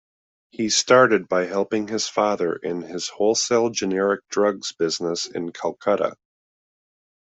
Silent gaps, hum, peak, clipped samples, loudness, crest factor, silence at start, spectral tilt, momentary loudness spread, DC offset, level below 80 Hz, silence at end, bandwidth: none; none; -4 dBFS; under 0.1%; -22 LUFS; 20 dB; 0.6 s; -3 dB/octave; 12 LU; under 0.1%; -68 dBFS; 1.2 s; 8.2 kHz